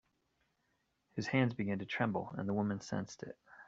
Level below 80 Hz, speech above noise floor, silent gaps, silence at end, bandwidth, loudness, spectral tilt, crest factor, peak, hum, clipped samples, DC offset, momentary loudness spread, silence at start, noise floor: -72 dBFS; 44 dB; none; 0.05 s; 7.8 kHz; -37 LUFS; -6 dB/octave; 22 dB; -16 dBFS; none; under 0.1%; under 0.1%; 13 LU; 1.15 s; -80 dBFS